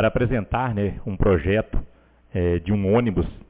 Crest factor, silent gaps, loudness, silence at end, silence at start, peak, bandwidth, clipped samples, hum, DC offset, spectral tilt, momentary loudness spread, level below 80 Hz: 16 dB; none; -23 LUFS; 0.1 s; 0 s; -6 dBFS; 4 kHz; under 0.1%; none; under 0.1%; -12 dB/octave; 8 LU; -32 dBFS